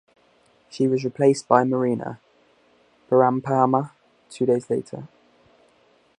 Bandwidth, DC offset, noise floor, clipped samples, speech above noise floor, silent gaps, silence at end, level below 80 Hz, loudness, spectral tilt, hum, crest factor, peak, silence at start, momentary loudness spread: 10.5 kHz; under 0.1%; -60 dBFS; under 0.1%; 39 dB; none; 1.1 s; -68 dBFS; -21 LUFS; -7 dB/octave; none; 22 dB; -2 dBFS; 0.75 s; 18 LU